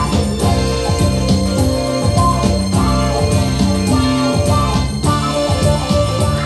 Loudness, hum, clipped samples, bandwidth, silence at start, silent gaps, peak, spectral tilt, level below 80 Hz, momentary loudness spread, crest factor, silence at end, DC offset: -15 LUFS; none; under 0.1%; 13.5 kHz; 0 s; none; -2 dBFS; -5.5 dB/octave; -24 dBFS; 2 LU; 14 dB; 0 s; under 0.1%